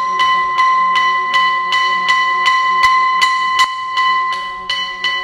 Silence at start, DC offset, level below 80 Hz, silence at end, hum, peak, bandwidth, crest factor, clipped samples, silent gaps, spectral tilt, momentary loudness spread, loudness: 0 s; under 0.1%; -54 dBFS; 0 s; none; 0 dBFS; 13 kHz; 14 dB; under 0.1%; none; 0.5 dB/octave; 6 LU; -13 LUFS